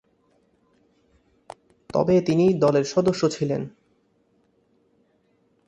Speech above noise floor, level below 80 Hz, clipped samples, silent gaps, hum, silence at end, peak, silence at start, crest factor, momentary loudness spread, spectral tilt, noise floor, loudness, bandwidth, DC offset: 45 dB; -60 dBFS; under 0.1%; none; none; 2 s; -6 dBFS; 1.95 s; 18 dB; 9 LU; -6.5 dB/octave; -65 dBFS; -22 LUFS; 10.5 kHz; under 0.1%